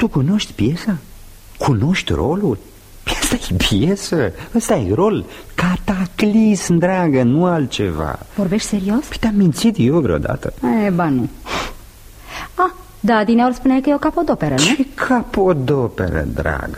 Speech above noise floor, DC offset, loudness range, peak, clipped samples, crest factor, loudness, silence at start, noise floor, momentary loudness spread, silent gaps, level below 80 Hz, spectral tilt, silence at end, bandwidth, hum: 23 dB; under 0.1%; 3 LU; -2 dBFS; under 0.1%; 16 dB; -17 LUFS; 0 s; -39 dBFS; 9 LU; none; -34 dBFS; -5.5 dB/octave; 0 s; 15.5 kHz; none